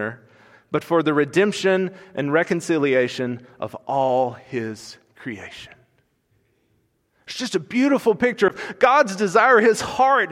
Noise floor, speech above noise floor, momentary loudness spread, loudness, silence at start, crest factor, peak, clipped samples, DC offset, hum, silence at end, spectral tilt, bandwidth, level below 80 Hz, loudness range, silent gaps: -66 dBFS; 46 dB; 17 LU; -20 LUFS; 0 s; 18 dB; -2 dBFS; under 0.1%; under 0.1%; none; 0 s; -5 dB/octave; 15.5 kHz; -62 dBFS; 11 LU; none